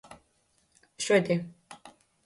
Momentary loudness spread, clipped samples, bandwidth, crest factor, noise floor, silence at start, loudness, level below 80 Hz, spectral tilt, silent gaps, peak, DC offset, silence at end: 25 LU; under 0.1%; 11.5 kHz; 22 dB; -70 dBFS; 0.1 s; -27 LUFS; -72 dBFS; -4.5 dB/octave; none; -10 dBFS; under 0.1%; 0.35 s